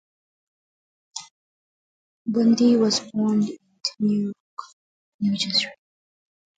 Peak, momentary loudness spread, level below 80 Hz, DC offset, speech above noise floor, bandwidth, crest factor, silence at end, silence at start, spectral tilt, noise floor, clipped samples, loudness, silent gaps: -8 dBFS; 20 LU; -70 dBFS; under 0.1%; over 69 dB; 9.2 kHz; 18 dB; 0.85 s; 1.15 s; -4.5 dB/octave; under -90 dBFS; under 0.1%; -22 LUFS; 1.31-2.25 s, 4.40-4.57 s, 4.73-5.19 s